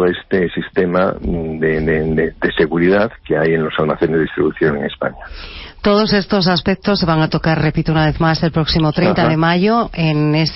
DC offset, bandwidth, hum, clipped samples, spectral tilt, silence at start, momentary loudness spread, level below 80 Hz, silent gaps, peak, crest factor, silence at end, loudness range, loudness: under 0.1%; 6 kHz; none; under 0.1%; -9 dB/octave; 0 s; 6 LU; -34 dBFS; none; -2 dBFS; 12 dB; 0 s; 2 LU; -15 LUFS